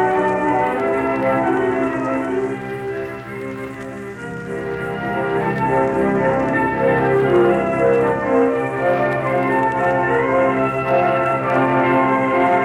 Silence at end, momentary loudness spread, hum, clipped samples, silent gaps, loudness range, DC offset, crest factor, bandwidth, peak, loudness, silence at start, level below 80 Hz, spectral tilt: 0 s; 12 LU; none; under 0.1%; none; 7 LU; under 0.1%; 14 dB; 13 kHz; -4 dBFS; -18 LUFS; 0 s; -46 dBFS; -7.5 dB/octave